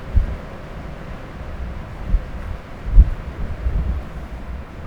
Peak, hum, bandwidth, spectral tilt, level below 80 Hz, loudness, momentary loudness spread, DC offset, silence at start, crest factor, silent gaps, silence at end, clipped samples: 0 dBFS; none; 5.4 kHz; -8 dB/octave; -22 dBFS; -26 LUFS; 16 LU; under 0.1%; 0 s; 20 dB; none; 0 s; 0.1%